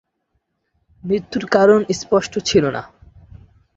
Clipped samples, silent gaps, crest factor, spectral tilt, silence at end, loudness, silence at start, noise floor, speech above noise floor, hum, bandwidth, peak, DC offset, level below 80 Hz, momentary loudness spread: under 0.1%; none; 20 dB; -5 dB/octave; 0.9 s; -17 LUFS; 1.05 s; -71 dBFS; 54 dB; none; 8 kHz; 0 dBFS; under 0.1%; -50 dBFS; 10 LU